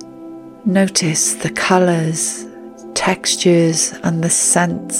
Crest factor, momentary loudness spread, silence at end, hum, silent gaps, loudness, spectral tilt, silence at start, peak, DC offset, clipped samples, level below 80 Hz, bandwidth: 16 dB; 18 LU; 0 s; none; none; -15 LUFS; -3.5 dB/octave; 0 s; 0 dBFS; under 0.1%; under 0.1%; -54 dBFS; 16.5 kHz